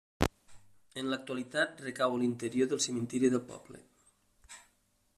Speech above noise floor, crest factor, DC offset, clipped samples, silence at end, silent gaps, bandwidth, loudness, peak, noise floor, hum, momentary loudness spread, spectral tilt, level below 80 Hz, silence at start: 40 dB; 28 dB; under 0.1%; under 0.1%; 0.6 s; none; 14 kHz; -33 LUFS; -8 dBFS; -73 dBFS; none; 22 LU; -4 dB/octave; -54 dBFS; 0.2 s